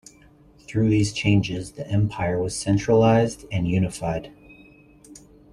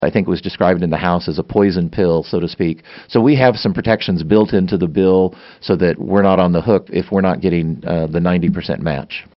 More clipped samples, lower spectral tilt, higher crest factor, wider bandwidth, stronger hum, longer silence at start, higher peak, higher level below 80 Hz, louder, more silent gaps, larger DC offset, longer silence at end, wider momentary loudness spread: neither; about the same, -6.5 dB/octave vs -6 dB/octave; about the same, 18 dB vs 16 dB; first, 11.5 kHz vs 6 kHz; neither; first, 0.7 s vs 0 s; second, -4 dBFS vs 0 dBFS; about the same, -46 dBFS vs -42 dBFS; second, -22 LUFS vs -16 LUFS; neither; neither; first, 0.4 s vs 0.15 s; first, 11 LU vs 7 LU